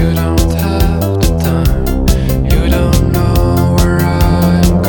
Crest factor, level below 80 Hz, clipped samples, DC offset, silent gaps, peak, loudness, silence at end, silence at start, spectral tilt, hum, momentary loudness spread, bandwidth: 10 dB; -14 dBFS; under 0.1%; under 0.1%; none; 0 dBFS; -12 LUFS; 0 s; 0 s; -6.5 dB/octave; none; 3 LU; 19.5 kHz